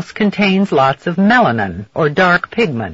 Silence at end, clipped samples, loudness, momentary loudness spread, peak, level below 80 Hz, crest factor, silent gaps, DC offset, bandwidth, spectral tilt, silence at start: 0 s; under 0.1%; -14 LUFS; 7 LU; -2 dBFS; -50 dBFS; 12 dB; none; under 0.1%; 7.8 kHz; -4.5 dB/octave; 0 s